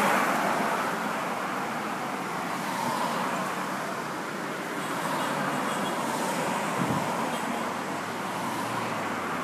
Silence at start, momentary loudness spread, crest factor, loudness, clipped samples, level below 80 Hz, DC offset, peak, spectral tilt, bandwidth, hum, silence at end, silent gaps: 0 s; 5 LU; 18 dB; -29 LUFS; under 0.1%; -70 dBFS; under 0.1%; -12 dBFS; -4 dB/octave; 15.5 kHz; none; 0 s; none